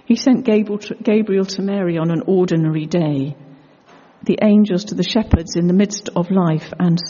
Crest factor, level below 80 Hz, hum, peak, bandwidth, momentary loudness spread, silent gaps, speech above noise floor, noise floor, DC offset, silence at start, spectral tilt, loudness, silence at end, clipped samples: 16 dB; -36 dBFS; none; 0 dBFS; 7.2 kHz; 7 LU; none; 31 dB; -47 dBFS; under 0.1%; 0.1 s; -7 dB/octave; -17 LUFS; 0 s; under 0.1%